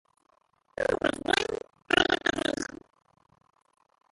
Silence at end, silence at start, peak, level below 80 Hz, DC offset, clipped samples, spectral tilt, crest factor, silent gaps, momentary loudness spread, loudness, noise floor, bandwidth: 1.5 s; 0.8 s; -6 dBFS; -58 dBFS; under 0.1%; under 0.1%; -3 dB/octave; 24 dB; none; 14 LU; -28 LUFS; -47 dBFS; 11.5 kHz